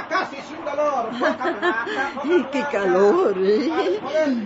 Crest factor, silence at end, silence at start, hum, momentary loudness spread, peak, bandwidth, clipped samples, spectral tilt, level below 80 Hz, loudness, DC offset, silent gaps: 16 dB; 0 s; 0 s; none; 7 LU; -6 dBFS; 8 kHz; under 0.1%; -5.5 dB/octave; -62 dBFS; -21 LUFS; under 0.1%; none